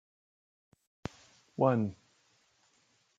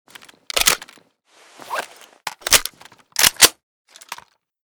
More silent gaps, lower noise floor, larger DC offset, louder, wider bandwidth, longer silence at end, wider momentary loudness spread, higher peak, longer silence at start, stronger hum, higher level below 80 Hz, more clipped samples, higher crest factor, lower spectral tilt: second, none vs 3.63-3.85 s; first, -71 dBFS vs -54 dBFS; neither; second, -31 LUFS vs -16 LUFS; second, 7.8 kHz vs over 20 kHz; first, 1.25 s vs 0.55 s; second, 18 LU vs 24 LU; second, -12 dBFS vs 0 dBFS; first, 1.6 s vs 0.55 s; neither; second, -68 dBFS vs -46 dBFS; neither; about the same, 26 dB vs 22 dB; first, -8.5 dB/octave vs 1 dB/octave